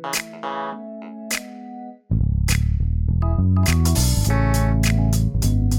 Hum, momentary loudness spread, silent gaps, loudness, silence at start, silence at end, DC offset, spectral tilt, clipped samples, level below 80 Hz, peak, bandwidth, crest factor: none; 17 LU; none; -21 LUFS; 0 s; 0 s; under 0.1%; -5 dB/octave; under 0.1%; -24 dBFS; -6 dBFS; 19 kHz; 14 dB